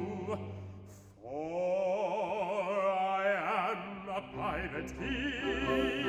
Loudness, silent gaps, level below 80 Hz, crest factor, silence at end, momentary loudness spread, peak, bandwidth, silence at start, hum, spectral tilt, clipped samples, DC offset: -34 LUFS; none; -54 dBFS; 14 dB; 0 s; 13 LU; -20 dBFS; 14 kHz; 0 s; none; -5.5 dB/octave; under 0.1%; under 0.1%